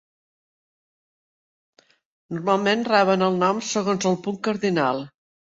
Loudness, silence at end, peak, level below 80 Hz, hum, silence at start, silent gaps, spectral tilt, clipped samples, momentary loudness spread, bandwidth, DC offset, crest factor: -22 LUFS; 0.5 s; -4 dBFS; -68 dBFS; none; 2.3 s; none; -5 dB/octave; under 0.1%; 10 LU; 7.8 kHz; under 0.1%; 20 dB